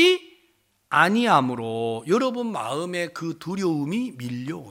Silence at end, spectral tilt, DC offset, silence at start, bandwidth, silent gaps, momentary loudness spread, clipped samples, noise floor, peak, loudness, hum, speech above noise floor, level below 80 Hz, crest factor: 0 s; -5 dB/octave; under 0.1%; 0 s; 16.5 kHz; none; 12 LU; under 0.1%; -65 dBFS; -2 dBFS; -24 LUFS; none; 42 dB; -70 dBFS; 20 dB